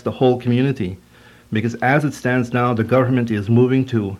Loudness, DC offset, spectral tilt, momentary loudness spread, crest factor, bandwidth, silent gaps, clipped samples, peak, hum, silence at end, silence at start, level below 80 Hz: -18 LUFS; under 0.1%; -7.5 dB/octave; 8 LU; 16 dB; 12.5 kHz; none; under 0.1%; -2 dBFS; none; 0 s; 0.05 s; -54 dBFS